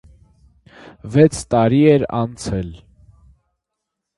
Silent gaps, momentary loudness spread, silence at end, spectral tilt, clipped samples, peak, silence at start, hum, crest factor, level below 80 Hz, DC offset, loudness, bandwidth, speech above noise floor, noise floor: none; 14 LU; 1.4 s; -7 dB/octave; under 0.1%; 0 dBFS; 1.05 s; none; 20 dB; -42 dBFS; under 0.1%; -16 LUFS; 11.5 kHz; 64 dB; -80 dBFS